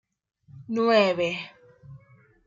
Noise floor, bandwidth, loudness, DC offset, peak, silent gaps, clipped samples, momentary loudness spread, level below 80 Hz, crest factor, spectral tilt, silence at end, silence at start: -56 dBFS; 7.6 kHz; -24 LUFS; under 0.1%; -8 dBFS; none; under 0.1%; 14 LU; -68 dBFS; 20 dB; -5.5 dB/octave; 0.5 s; 0.55 s